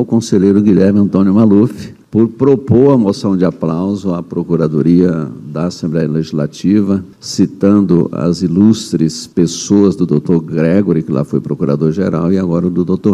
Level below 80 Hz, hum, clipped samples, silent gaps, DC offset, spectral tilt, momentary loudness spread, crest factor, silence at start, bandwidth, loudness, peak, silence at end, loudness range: -46 dBFS; none; 0.2%; none; under 0.1%; -7.5 dB/octave; 8 LU; 12 dB; 0 s; 11.5 kHz; -13 LUFS; 0 dBFS; 0 s; 4 LU